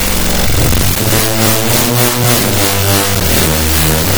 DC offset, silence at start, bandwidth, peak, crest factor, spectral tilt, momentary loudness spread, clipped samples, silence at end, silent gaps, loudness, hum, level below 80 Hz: under 0.1%; 0 s; over 20 kHz; 0 dBFS; 10 dB; -3.5 dB/octave; 2 LU; under 0.1%; 0 s; none; -10 LUFS; none; -22 dBFS